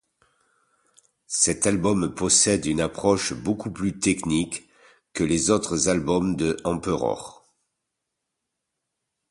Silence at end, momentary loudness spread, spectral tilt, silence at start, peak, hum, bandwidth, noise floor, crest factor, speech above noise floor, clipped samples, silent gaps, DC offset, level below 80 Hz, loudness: 2 s; 10 LU; -4 dB/octave; 1.3 s; -6 dBFS; none; 11.5 kHz; -82 dBFS; 20 dB; 58 dB; under 0.1%; none; under 0.1%; -48 dBFS; -23 LUFS